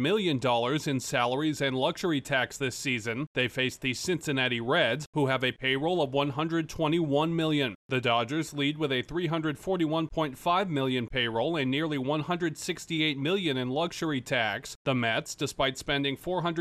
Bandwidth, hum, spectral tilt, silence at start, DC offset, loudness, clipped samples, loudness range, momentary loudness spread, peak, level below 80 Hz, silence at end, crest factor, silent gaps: 14.5 kHz; none; -5 dB/octave; 0 s; under 0.1%; -29 LUFS; under 0.1%; 2 LU; 4 LU; -12 dBFS; -56 dBFS; 0 s; 16 dB; 3.27-3.35 s, 5.06-5.13 s, 7.75-7.89 s, 14.76-14.85 s